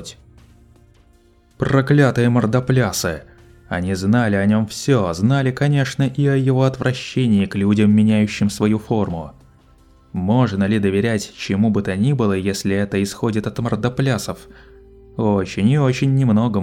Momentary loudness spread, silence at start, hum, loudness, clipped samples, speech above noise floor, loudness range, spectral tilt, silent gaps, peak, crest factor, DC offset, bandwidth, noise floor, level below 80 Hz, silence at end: 9 LU; 0 s; none; -18 LUFS; under 0.1%; 36 dB; 3 LU; -6.5 dB/octave; none; -2 dBFS; 16 dB; under 0.1%; 15.5 kHz; -53 dBFS; -46 dBFS; 0 s